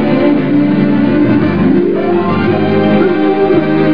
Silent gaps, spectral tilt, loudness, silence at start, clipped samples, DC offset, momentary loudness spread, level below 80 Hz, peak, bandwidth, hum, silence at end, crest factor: none; -10 dB/octave; -11 LUFS; 0 s; under 0.1%; 4%; 2 LU; -46 dBFS; 0 dBFS; 5.2 kHz; none; 0 s; 10 dB